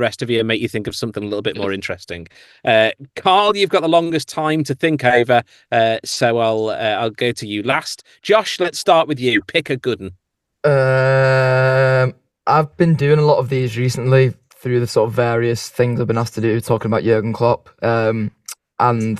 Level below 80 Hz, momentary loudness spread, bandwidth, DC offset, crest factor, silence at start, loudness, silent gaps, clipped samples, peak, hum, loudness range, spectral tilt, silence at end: -54 dBFS; 10 LU; 13.5 kHz; under 0.1%; 16 dB; 0 s; -17 LUFS; none; under 0.1%; 0 dBFS; none; 3 LU; -5.5 dB/octave; 0 s